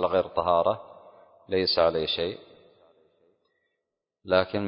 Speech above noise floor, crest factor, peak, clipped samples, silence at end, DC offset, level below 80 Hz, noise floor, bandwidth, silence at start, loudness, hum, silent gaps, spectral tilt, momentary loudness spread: 59 dB; 22 dB; -6 dBFS; under 0.1%; 0 s; under 0.1%; -54 dBFS; -84 dBFS; 5.4 kHz; 0 s; -26 LUFS; none; none; -9 dB/octave; 10 LU